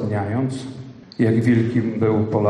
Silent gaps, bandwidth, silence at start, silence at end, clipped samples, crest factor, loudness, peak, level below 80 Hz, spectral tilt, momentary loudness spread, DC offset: none; 10 kHz; 0 s; 0 s; under 0.1%; 14 dB; -20 LUFS; -6 dBFS; -56 dBFS; -8.5 dB/octave; 17 LU; under 0.1%